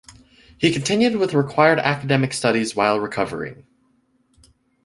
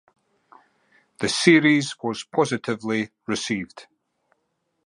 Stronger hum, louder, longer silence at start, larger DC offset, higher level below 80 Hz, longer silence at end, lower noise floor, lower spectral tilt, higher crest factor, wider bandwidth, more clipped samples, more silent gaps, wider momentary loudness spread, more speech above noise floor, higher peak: neither; first, -19 LUFS vs -22 LUFS; second, 0.1 s vs 1.2 s; neither; first, -56 dBFS vs -64 dBFS; first, 1.3 s vs 1.05 s; second, -63 dBFS vs -74 dBFS; about the same, -5 dB/octave vs -4.5 dB/octave; about the same, 20 dB vs 22 dB; about the same, 11.5 kHz vs 11.5 kHz; neither; neither; second, 9 LU vs 13 LU; second, 44 dB vs 52 dB; about the same, -2 dBFS vs -2 dBFS